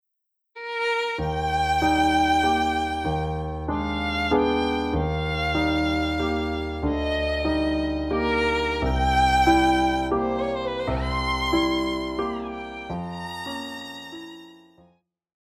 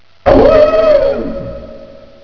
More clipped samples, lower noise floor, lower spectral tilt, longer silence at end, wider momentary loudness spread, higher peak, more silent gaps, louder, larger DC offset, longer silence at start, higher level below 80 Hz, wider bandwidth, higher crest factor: second, under 0.1% vs 0.5%; first, -79 dBFS vs -34 dBFS; second, -5.5 dB/octave vs -8 dB/octave; first, 1 s vs 0.4 s; second, 12 LU vs 19 LU; second, -6 dBFS vs 0 dBFS; neither; second, -24 LUFS vs -9 LUFS; neither; first, 0.55 s vs 0.25 s; second, -36 dBFS vs -26 dBFS; first, 15 kHz vs 5.4 kHz; first, 18 dB vs 12 dB